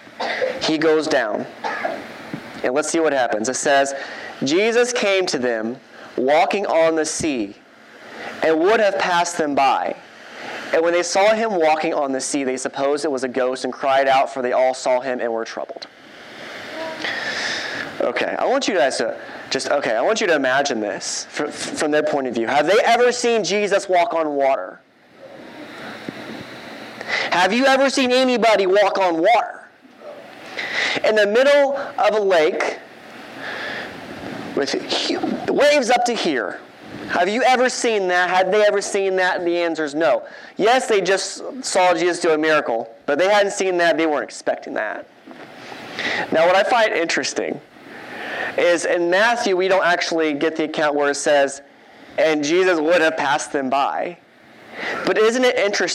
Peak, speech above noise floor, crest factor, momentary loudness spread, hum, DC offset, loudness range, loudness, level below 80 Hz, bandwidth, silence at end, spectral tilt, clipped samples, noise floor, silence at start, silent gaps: -6 dBFS; 27 dB; 14 dB; 17 LU; none; under 0.1%; 4 LU; -19 LUFS; -66 dBFS; 14 kHz; 0 s; -3 dB/octave; under 0.1%; -45 dBFS; 0.05 s; none